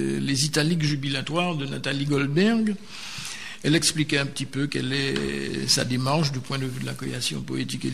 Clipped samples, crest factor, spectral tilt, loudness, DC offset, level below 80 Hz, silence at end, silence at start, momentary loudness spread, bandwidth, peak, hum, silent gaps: under 0.1%; 20 dB; -4 dB/octave; -25 LUFS; 0.7%; -54 dBFS; 0 s; 0 s; 9 LU; 14 kHz; -4 dBFS; none; none